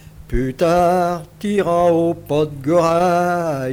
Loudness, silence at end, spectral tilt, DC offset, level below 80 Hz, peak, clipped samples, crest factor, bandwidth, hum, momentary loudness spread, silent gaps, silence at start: -17 LUFS; 0 s; -6.5 dB/octave; under 0.1%; -36 dBFS; -4 dBFS; under 0.1%; 12 dB; 17 kHz; none; 8 LU; none; 0.05 s